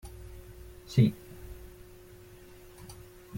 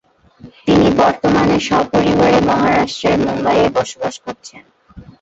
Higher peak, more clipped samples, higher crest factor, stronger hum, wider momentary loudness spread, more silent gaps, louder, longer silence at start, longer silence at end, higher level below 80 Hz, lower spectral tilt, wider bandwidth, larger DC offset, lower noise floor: second, -12 dBFS vs -2 dBFS; neither; first, 24 dB vs 14 dB; neither; first, 26 LU vs 12 LU; neither; second, -28 LUFS vs -14 LUFS; second, 0.05 s vs 0.45 s; second, 0 s vs 0.2 s; second, -52 dBFS vs -40 dBFS; first, -7.5 dB/octave vs -5.5 dB/octave; first, 17 kHz vs 8 kHz; neither; first, -52 dBFS vs -42 dBFS